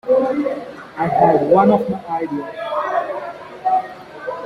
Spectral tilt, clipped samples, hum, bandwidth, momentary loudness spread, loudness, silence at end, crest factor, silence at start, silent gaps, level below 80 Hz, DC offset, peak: -8.5 dB/octave; under 0.1%; none; 11 kHz; 16 LU; -18 LUFS; 0 s; 16 dB; 0.05 s; none; -56 dBFS; under 0.1%; -2 dBFS